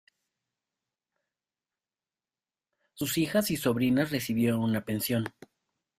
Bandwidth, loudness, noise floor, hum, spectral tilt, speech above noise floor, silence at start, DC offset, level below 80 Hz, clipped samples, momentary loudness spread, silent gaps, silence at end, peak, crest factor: 16 kHz; -28 LUFS; under -90 dBFS; none; -5 dB/octave; over 62 dB; 2.95 s; under 0.1%; -64 dBFS; under 0.1%; 5 LU; none; 0.7 s; -12 dBFS; 18 dB